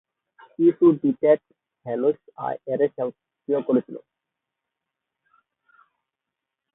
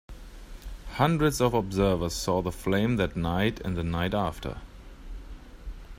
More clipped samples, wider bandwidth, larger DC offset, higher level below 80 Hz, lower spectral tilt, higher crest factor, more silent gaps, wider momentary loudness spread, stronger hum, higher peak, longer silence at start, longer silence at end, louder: neither; second, 3.9 kHz vs 16 kHz; neither; second, -72 dBFS vs -42 dBFS; first, -12 dB/octave vs -6 dB/octave; about the same, 20 dB vs 20 dB; neither; about the same, 23 LU vs 22 LU; neither; about the same, -6 dBFS vs -8 dBFS; first, 0.6 s vs 0.1 s; first, 2.75 s vs 0 s; first, -23 LUFS vs -27 LUFS